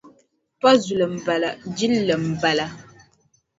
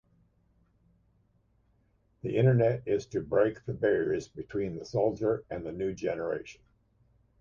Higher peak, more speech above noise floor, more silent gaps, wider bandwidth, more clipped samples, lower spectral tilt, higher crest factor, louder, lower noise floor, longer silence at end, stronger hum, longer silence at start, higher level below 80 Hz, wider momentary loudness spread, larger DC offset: first, -2 dBFS vs -14 dBFS; about the same, 43 dB vs 40 dB; neither; about the same, 8 kHz vs 7.4 kHz; neither; second, -5 dB/octave vs -8 dB/octave; about the same, 20 dB vs 18 dB; first, -21 LUFS vs -30 LUFS; second, -63 dBFS vs -69 dBFS; about the same, 0.8 s vs 0.9 s; neither; second, 0.05 s vs 2.25 s; about the same, -60 dBFS vs -60 dBFS; second, 8 LU vs 11 LU; neither